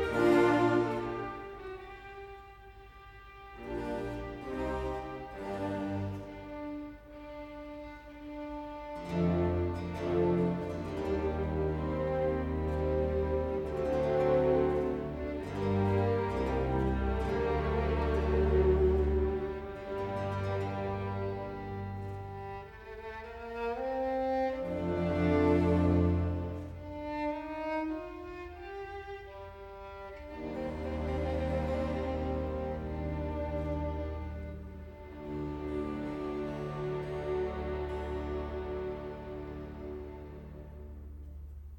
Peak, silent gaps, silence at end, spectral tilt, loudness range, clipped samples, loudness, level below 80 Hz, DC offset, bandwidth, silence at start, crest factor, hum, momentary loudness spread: -14 dBFS; none; 0 s; -8.5 dB/octave; 10 LU; under 0.1%; -33 LUFS; -42 dBFS; under 0.1%; 17 kHz; 0 s; 18 dB; none; 19 LU